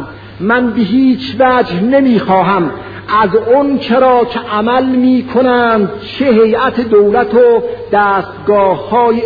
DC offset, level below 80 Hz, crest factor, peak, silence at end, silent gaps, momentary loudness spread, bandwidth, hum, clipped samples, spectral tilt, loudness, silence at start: 0.2%; -44 dBFS; 10 dB; 0 dBFS; 0 s; none; 6 LU; 5 kHz; none; under 0.1%; -8.5 dB/octave; -11 LUFS; 0 s